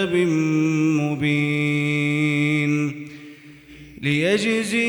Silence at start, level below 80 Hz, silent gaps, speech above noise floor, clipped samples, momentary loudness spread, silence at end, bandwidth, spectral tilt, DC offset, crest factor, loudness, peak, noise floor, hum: 0 s; -60 dBFS; none; 24 dB; under 0.1%; 8 LU; 0 s; over 20 kHz; -6 dB/octave; under 0.1%; 12 dB; -20 LUFS; -8 dBFS; -44 dBFS; none